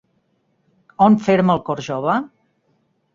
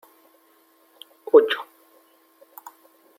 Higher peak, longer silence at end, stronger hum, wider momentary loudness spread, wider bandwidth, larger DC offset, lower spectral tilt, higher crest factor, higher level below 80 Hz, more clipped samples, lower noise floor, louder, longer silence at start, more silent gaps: about the same, -2 dBFS vs -2 dBFS; second, 0.9 s vs 1.55 s; neither; second, 10 LU vs 27 LU; second, 7.4 kHz vs 16.5 kHz; neither; first, -7.5 dB/octave vs -3.5 dB/octave; second, 18 dB vs 24 dB; first, -56 dBFS vs -82 dBFS; neither; first, -65 dBFS vs -59 dBFS; about the same, -17 LUFS vs -19 LUFS; second, 1 s vs 1.35 s; neither